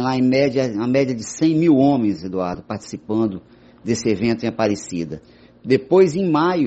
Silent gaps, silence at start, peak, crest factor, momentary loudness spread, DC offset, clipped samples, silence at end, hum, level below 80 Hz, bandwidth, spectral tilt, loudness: none; 0 s; -2 dBFS; 16 dB; 15 LU; under 0.1%; under 0.1%; 0 s; none; -54 dBFS; 8.4 kHz; -6.5 dB/octave; -19 LUFS